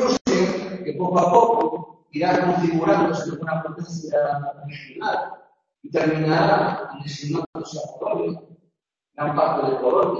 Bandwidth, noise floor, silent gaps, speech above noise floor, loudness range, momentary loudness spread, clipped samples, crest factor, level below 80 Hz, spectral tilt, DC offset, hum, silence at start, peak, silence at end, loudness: 7.6 kHz; -73 dBFS; 0.21-0.25 s, 7.46-7.53 s; 51 dB; 5 LU; 14 LU; under 0.1%; 20 dB; -60 dBFS; -6 dB/octave; under 0.1%; none; 0 s; -2 dBFS; 0 s; -22 LUFS